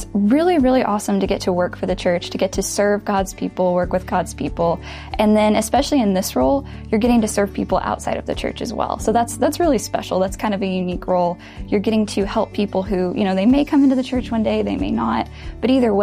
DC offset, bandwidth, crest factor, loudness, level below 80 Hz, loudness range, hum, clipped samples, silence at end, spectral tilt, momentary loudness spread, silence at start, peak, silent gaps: under 0.1%; 15.5 kHz; 14 dB; -19 LUFS; -36 dBFS; 3 LU; none; under 0.1%; 0 s; -5.5 dB/octave; 8 LU; 0 s; -4 dBFS; none